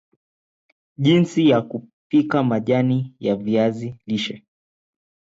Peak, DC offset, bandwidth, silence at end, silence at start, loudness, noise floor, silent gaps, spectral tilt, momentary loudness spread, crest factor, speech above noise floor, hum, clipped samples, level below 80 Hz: -6 dBFS; under 0.1%; 7.8 kHz; 0.95 s; 1 s; -20 LUFS; under -90 dBFS; 1.93-2.10 s; -7.5 dB/octave; 13 LU; 16 dB; over 71 dB; none; under 0.1%; -62 dBFS